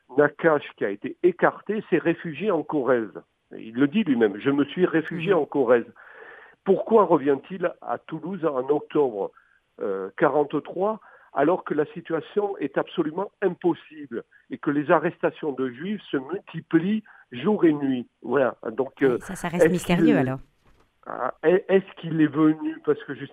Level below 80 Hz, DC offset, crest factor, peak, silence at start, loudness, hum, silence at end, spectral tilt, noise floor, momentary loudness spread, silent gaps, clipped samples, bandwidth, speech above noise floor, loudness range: -60 dBFS; under 0.1%; 20 dB; -4 dBFS; 0.1 s; -24 LUFS; none; 0.05 s; -7 dB/octave; -60 dBFS; 12 LU; none; under 0.1%; 13.5 kHz; 36 dB; 4 LU